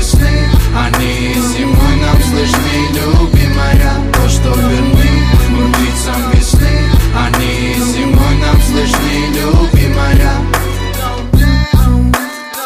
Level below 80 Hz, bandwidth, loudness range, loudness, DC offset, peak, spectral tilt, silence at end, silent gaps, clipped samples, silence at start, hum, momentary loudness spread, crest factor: -12 dBFS; 16 kHz; 1 LU; -11 LUFS; under 0.1%; 0 dBFS; -5.5 dB/octave; 0 s; none; under 0.1%; 0 s; none; 4 LU; 10 dB